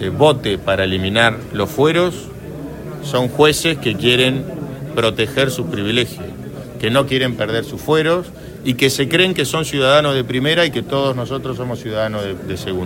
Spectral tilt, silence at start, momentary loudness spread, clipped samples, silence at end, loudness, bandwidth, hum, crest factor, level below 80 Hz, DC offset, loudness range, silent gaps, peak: -4.5 dB/octave; 0 s; 14 LU; under 0.1%; 0 s; -17 LUFS; 16.5 kHz; none; 18 dB; -44 dBFS; under 0.1%; 3 LU; none; 0 dBFS